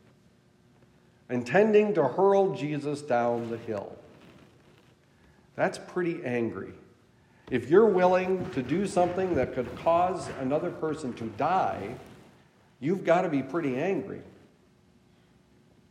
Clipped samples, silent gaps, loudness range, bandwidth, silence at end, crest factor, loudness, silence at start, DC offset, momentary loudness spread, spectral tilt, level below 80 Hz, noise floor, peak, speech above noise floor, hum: under 0.1%; none; 8 LU; 11 kHz; 1.6 s; 20 dB; -27 LUFS; 1.3 s; under 0.1%; 14 LU; -7 dB/octave; -64 dBFS; -61 dBFS; -8 dBFS; 35 dB; none